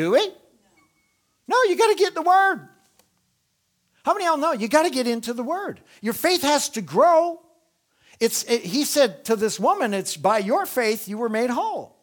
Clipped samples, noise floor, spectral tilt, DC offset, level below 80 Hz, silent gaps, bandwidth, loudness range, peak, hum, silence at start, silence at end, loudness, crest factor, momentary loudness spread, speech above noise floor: under 0.1%; -71 dBFS; -3 dB/octave; under 0.1%; -70 dBFS; none; over 20 kHz; 3 LU; -2 dBFS; none; 0 s; 0.15 s; -21 LUFS; 20 dB; 10 LU; 50 dB